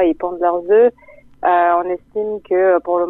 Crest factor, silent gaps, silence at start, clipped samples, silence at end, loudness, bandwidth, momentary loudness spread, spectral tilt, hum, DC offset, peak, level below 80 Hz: 12 dB; none; 0 s; under 0.1%; 0 s; -16 LUFS; 4 kHz; 10 LU; -8.5 dB/octave; none; under 0.1%; -4 dBFS; -52 dBFS